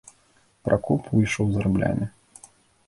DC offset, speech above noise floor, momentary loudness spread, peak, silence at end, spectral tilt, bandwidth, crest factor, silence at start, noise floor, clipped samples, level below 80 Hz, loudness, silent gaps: under 0.1%; 39 dB; 9 LU; -4 dBFS; 0.8 s; -7 dB/octave; 11.5 kHz; 22 dB; 0.65 s; -61 dBFS; under 0.1%; -46 dBFS; -24 LUFS; none